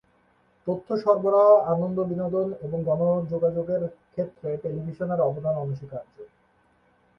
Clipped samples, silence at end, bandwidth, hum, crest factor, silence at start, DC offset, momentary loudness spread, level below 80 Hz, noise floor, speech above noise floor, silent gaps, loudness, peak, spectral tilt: under 0.1%; 0.9 s; 5.8 kHz; none; 20 dB; 0.65 s; under 0.1%; 14 LU; -62 dBFS; -64 dBFS; 39 dB; none; -25 LUFS; -6 dBFS; -11 dB/octave